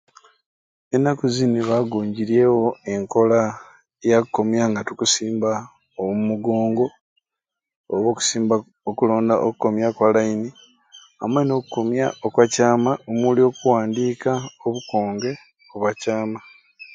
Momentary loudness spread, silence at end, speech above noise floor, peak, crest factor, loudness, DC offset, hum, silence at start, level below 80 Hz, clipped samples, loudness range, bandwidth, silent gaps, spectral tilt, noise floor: 10 LU; 0 s; 66 dB; 0 dBFS; 20 dB; -21 LUFS; under 0.1%; none; 0.9 s; -64 dBFS; under 0.1%; 3 LU; 9.6 kHz; 7.01-7.16 s, 7.76-7.84 s; -5 dB/octave; -85 dBFS